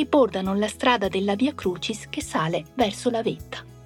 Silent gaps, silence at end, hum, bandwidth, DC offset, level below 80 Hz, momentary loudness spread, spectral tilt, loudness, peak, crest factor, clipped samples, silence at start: none; 0 s; none; 17.5 kHz; under 0.1%; -50 dBFS; 9 LU; -5 dB/octave; -24 LUFS; -6 dBFS; 18 dB; under 0.1%; 0 s